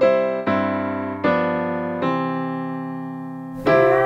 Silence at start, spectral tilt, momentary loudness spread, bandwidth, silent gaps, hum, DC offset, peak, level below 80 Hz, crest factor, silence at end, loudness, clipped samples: 0 s; -8 dB/octave; 12 LU; 7.4 kHz; none; none; under 0.1%; -4 dBFS; -56 dBFS; 16 dB; 0 s; -22 LUFS; under 0.1%